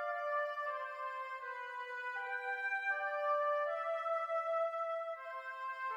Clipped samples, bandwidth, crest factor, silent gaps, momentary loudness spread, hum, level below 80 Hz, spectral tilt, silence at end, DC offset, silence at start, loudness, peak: under 0.1%; 12 kHz; 12 dB; none; 8 LU; none; under -90 dBFS; 1.5 dB/octave; 0 s; under 0.1%; 0 s; -38 LUFS; -26 dBFS